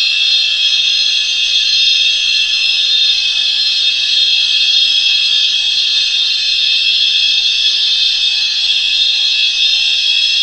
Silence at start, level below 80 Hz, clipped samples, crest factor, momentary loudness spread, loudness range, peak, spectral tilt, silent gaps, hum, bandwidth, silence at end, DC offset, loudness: 0 s; -50 dBFS; under 0.1%; 12 dB; 2 LU; 0 LU; 0 dBFS; 4 dB/octave; none; none; 11 kHz; 0 s; 0.1%; -9 LUFS